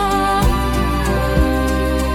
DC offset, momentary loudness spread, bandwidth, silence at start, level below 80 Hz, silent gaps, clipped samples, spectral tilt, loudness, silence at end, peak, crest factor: under 0.1%; 2 LU; 17.5 kHz; 0 s; -20 dBFS; none; under 0.1%; -6 dB/octave; -17 LUFS; 0 s; -2 dBFS; 14 dB